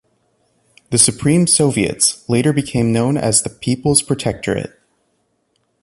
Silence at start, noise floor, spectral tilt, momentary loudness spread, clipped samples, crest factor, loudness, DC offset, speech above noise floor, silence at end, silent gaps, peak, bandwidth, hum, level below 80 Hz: 0.9 s; -66 dBFS; -4 dB/octave; 9 LU; under 0.1%; 18 dB; -15 LUFS; under 0.1%; 50 dB; 1.15 s; none; 0 dBFS; 12 kHz; none; -44 dBFS